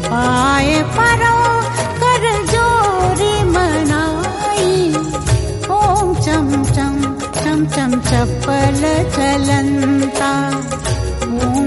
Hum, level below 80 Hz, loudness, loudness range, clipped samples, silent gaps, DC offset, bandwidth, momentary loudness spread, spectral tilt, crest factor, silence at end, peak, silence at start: none; -28 dBFS; -15 LUFS; 2 LU; under 0.1%; none; under 0.1%; 11.5 kHz; 6 LU; -5 dB/octave; 12 dB; 0 s; -2 dBFS; 0 s